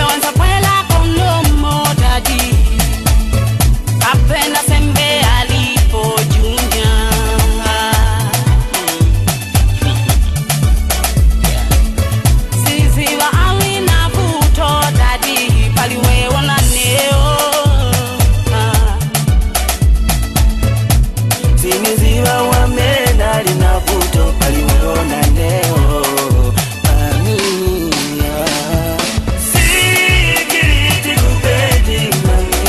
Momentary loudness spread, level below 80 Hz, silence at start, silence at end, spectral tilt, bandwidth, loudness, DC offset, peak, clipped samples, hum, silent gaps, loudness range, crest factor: 4 LU; -16 dBFS; 0 s; 0 s; -4 dB/octave; 13.5 kHz; -13 LUFS; under 0.1%; 0 dBFS; under 0.1%; none; none; 2 LU; 12 dB